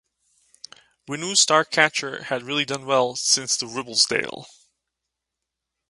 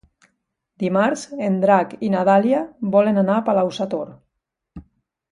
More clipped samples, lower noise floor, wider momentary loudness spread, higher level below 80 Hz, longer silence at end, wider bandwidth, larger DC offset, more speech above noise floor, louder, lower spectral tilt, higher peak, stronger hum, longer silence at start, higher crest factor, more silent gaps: neither; first, -84 dBFS vs -78 dBFS; first, 12 LU vs 9 LU; second, -70 dBFS vs -58 dBFS; first, 1.45 s vs 0.5 s; about the same, 11.5 kHz vs 11 kHz; neither; about the same, 61 dB vs 60 dB; about the same, -21 LUFS vs -19 LUFS; second, -1 dB/octave vs -7 dB/octave; about the same, 0 dBFS vs -2 dBFS; neither; first, 1.1 s vs 0.8 s; first, 24 dB vs 18 dB; neither